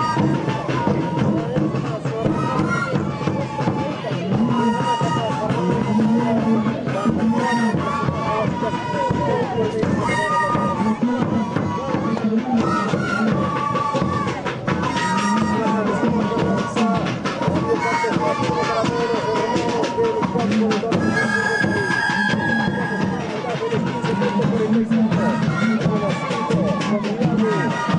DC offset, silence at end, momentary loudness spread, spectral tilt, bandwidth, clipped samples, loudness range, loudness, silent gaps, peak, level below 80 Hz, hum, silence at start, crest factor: under 0.1%; 0 s; 4 LU; -6.5 dB/octave; 10.5 kHz; under 0.1%; 2 LU; -20 LUFS; none; -8 dBFS; -48 dBFS; none; 0 s; 12 dB